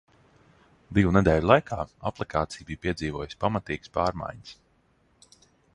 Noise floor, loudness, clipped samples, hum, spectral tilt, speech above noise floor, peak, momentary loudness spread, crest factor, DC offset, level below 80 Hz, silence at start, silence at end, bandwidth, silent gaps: -65 dBFS; -26 LUFS; under 0.1%; none; -7 dB/octave; 40 dB; -4 dBFS; 14 LU; 24 dB; under 0.1%; -44 dBFS; 0.9 s; 1.2 s; 11 kHz; none